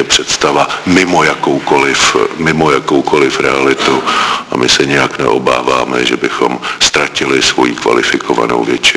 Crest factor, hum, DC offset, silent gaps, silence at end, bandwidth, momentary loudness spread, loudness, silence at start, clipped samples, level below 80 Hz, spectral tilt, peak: 10 dB; none; under 0.1%; none; 0 s; 11 kHz; 4 LU; -10 LUFS; 0 s; 0.4%; -42 dBFS; -3 dB/octave; 0 dBFS